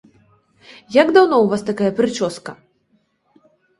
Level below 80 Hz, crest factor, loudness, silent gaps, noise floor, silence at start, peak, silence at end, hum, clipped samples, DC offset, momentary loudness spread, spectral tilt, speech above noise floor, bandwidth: -60 dBFS; 20 dB; -16 LUFS; none; -63 dBFS; 0.9 s; 0 dBFS; 1.25 s; none; under 0.1%; under 0.1%; 14 LU; -5.5 dB/octave; 47 dB; 11.5 kHz